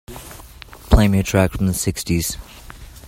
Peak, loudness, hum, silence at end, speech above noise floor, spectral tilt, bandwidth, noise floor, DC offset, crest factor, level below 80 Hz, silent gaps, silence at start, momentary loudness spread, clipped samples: 0 dBFS; -18 LUFS; none; 0 s; 21 dB; -5.5 dB/octave; 16.5 kHz; -40 dBFS; under 0.1%; 20 dB; -26 dBFS; none; 0.1 s; 24 LU; under 0.1%